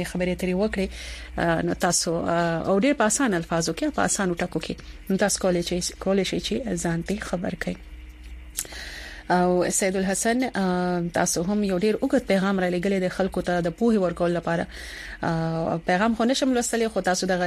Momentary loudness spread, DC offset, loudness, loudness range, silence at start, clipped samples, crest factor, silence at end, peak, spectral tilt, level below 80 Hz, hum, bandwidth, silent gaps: 11 LU; under 0.1%; -24 LUFS; 4 LU; 0 s; under 0.1%; 20 dB; 0 s; -4 dBFS; -4.5 dB/octave; -44 dBFS; none; 15 kHz; none